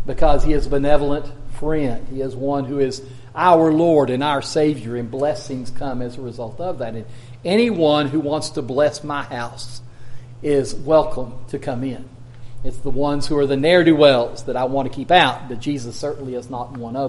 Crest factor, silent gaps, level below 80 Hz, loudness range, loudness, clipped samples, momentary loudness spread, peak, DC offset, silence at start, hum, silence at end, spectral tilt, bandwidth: 18 dB; none; -32 dBFS; 6 LU; -19 LUFS; under 0.1%; 16 LU; 0 dBFS; under 0.1%; 0 s; none; 0 s; -6 dB/octave; 11.5 kHz